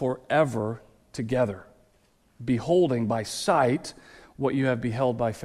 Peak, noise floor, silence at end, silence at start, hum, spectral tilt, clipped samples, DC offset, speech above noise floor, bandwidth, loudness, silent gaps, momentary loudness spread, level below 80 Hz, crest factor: -10 dBFS; -64 dBFS; 0 s; 0 s; none; -6 dB/octave; under 0.1%; under 0.1%; 38 dB; 14 kHz; -26 LUFS; none; 14 LU; -58 dBFS; 16 dB